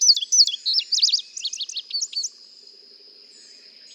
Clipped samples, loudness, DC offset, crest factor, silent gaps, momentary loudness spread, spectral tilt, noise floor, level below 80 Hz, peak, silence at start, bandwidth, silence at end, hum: under 0.1%; -19 LUFS; under 0.1%; 20 dB; none; 14 LU; 7 dB/octave; -48 dBFS; under -90 dBFS; -4 dBFS; 0 s; 18 kHz; 1.65 s; none